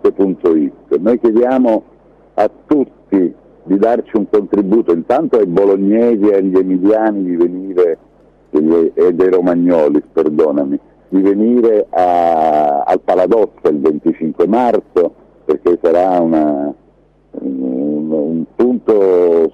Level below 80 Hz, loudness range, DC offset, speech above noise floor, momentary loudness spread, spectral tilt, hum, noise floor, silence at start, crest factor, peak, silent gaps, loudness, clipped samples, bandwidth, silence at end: -52 dBFS; 3 LU; under 0.1%; 37 dB; 7 LU; -9 dB/octave; none; -49 dBFS; 0.05 s; 10 dB; -2 dBFS; none; -13 LUFS; under 0.1%; 6.6 kHz; 0.05 s